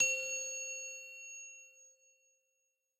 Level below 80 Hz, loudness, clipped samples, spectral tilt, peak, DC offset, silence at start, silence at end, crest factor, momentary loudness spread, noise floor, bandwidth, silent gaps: under -90 dBFS; -38 LUFS; under 0.1%; 2.5 dB/octave; -20 dBFS; under 0.1%; 0 s; 1.1 s; 22 dB; 18 LU; -83 dBFS; 16 kHz; none